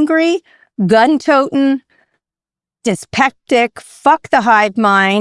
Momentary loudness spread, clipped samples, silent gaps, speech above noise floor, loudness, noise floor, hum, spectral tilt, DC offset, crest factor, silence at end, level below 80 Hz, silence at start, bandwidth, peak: 9 LU; under 0.1%; none; 77 dB; -13 LUFS; -90 dBFS; none; -5 dB/octave; under 0.1%; 14 dB; 0 s; -58 dBFS; 0 s; 12 kHz; 0 dBFS